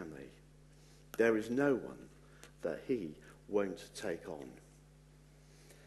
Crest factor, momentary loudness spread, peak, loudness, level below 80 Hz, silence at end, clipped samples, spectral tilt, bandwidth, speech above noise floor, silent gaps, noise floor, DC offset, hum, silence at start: 22 dB; 24 LU; -18 dBFS; -37 LUFS; -66 dBFS; 0 s; under 0.1%; -6 dB/octave; 12.5 kHz; 25 dB; none; -61 dBFS; under 0.1%; 50 Hz at -60 dBFS; 0 s